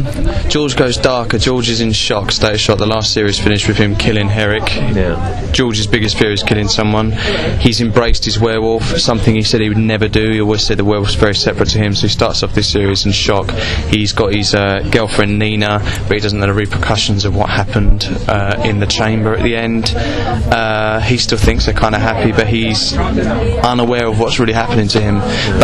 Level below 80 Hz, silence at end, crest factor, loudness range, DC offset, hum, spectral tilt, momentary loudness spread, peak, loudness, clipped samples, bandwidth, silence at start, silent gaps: -22 dBFS; 0 s; 12 dB; 1 LU; under 0.1%; none; -5 dB/octave; 3 LU; 0 dBFS; -13 LUFS; 0.1%; 12 kHz; 0 s; none